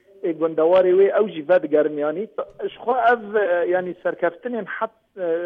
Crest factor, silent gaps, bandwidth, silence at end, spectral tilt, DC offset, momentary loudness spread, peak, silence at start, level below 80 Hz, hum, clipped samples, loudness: 14 dB; none; 4.3 kHz; 0 s; -8 dB/octave; under 0.1%; 13 LU; -6 dBFS; 0.25 s; -68 dBFS; none; under 0.1%; -21 LUFS